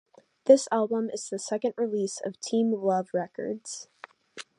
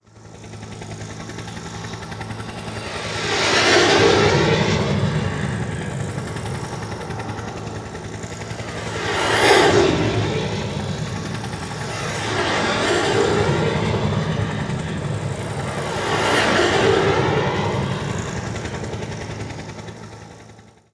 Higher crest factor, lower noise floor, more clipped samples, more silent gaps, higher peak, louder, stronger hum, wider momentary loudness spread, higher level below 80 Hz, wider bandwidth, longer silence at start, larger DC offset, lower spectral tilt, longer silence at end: about the same, 22 dB vs 22 dB; about the same, -48 dBFS vs -46 dBFS; neither; neither; second, -6 dBFS vs 0 dBFS; second, -27 LUFS vs -20 LUFS; neither; about the same, 18 LU vs 17 LU; second, -82 dBFS vs -42 dBFS; about the same, 11 kHz vs 11 kHz; first, 0.45 s vs 0.15 s; neither; about the same, -4.5 dB/octave vs -4.5 dB/octave; second, 0.15 s vs 0.3 s